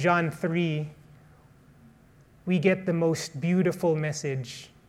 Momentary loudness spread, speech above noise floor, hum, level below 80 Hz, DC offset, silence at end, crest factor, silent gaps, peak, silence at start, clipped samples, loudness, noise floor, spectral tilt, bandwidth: 10 LU; 30 dB; none; -64 dBFS; under 0.1%; 0.2 s; 20 dB; none; -8 dBFS; 0 s; under 0.1%; -27 LUFS; -56 dBFS; -6 dB/octave; 14 kHz